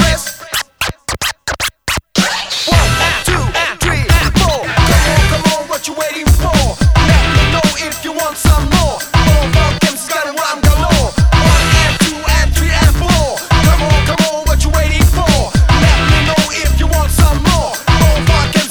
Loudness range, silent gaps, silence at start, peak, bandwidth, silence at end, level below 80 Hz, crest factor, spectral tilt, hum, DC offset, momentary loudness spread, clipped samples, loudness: 2 LU; none; 0 s; 0 dBFS; over 20 kHz; 0 s; -16 dBFS; 12 dB; -4.5 dB/octave; none; under 0.1%; 8 LU; under 0.1%; -12 LUFS